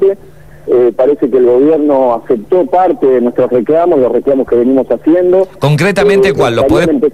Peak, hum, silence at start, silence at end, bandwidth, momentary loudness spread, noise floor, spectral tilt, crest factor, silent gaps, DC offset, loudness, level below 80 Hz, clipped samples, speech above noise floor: -2 dBFS; none; 0 s; 0.05 s; 12.5 kHz; 3 LU; -36 dBFS; -7 dB/octave; 8 dB; none; 1%; -10 LUFS; -40 dBFS; under 0.1%; 27 dB